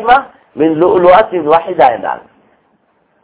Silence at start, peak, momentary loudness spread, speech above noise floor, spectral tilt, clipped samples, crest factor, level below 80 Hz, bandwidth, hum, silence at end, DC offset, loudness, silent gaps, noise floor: 0 s; 0 dBFS; 14 LU; 47 dB; -9.5 dB/octave; 2%; 12 dB; -46 dBFS; 4 kHz; none; 1.05 s; under 0.1%; -10 LUFS; none; -56 dBFS